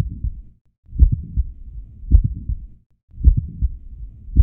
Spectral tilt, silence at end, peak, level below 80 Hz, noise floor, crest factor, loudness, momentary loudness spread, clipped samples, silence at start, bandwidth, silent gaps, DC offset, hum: -15 dB/octave; 0 s; 0 dBFS; -20 dBFS; -35 dBFS; 20 dB; -22 LUFS; 20 LU; under 0.1%; 0 s; 0.7 kHz; 0.61-0.65 s, 0.78-0.83 s, 2.86-2.90 s, 3.03-3.08 s; under 0.1%; none